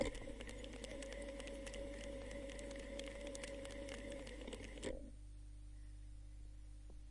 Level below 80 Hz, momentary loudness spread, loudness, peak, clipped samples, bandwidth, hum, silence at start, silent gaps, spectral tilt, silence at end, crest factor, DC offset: -54 dBFS; 9 LU; -51 LUFS; -26 dBFS; under 0.1%; 11.5 kHz; 50 Hz at -55 dBFS; 0 s; none; -4.5 dB/octave; 0 s; 22 dB; under 0.1%